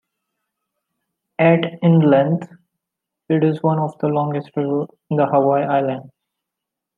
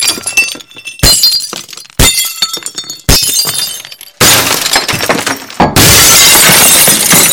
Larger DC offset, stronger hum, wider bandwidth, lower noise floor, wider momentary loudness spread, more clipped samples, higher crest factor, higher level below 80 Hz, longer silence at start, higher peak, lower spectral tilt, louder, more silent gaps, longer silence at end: neither; neither; second, 4.1 kHz vs over 20 kHz; first, -83 dBFS vs -27 dBFS; second, 10 LU vs 17 LU; second, under 0.1% vs 2%; first, 18 dB vs 8 dB; second, -66 dBFS vs -24 dBFS; first, 1.4 s vs 0 s; about the same, -2 dBFS vs 0 dBFS; first, -10 dB/octave vs -1 dB/octave; second, -18 LUFS vs -5 LUFS; neither; first, 0.9 s vs 0 s